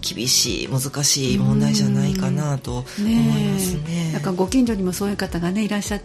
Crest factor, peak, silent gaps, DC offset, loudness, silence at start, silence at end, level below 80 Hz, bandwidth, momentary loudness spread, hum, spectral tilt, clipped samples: 16 dB; -6 dBFS; none; under 0.1%; -20 LUFS; 0 s; 0 s; -40 dBFS; 15.5 kHz; 7 LU; none; -4.5 dB/octave; under 0.1%